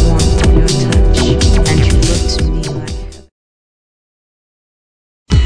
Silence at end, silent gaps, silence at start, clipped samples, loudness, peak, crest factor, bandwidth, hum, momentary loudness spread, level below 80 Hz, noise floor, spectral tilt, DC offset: 0 s; 3.32-5.26 s; 0 s; 0.1%; -12 LUFS; 0 dBFS; 12 dB; 10.5 kHz; none; 11 LU; -14 dBFS; under -90 dBFS; -5.5 dB/octave; under 0.1%